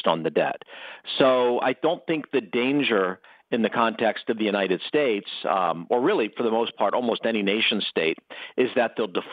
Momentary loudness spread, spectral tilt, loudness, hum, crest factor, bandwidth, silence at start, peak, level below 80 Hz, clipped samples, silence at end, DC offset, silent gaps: 7 LU; -7.5 dB/octave; -24 LUFS; none; 20 dB; 5 kHz; 0.05 s; -4 dBFS; -80 dBFS; under 0.1%; 0 s; under 0.1%; none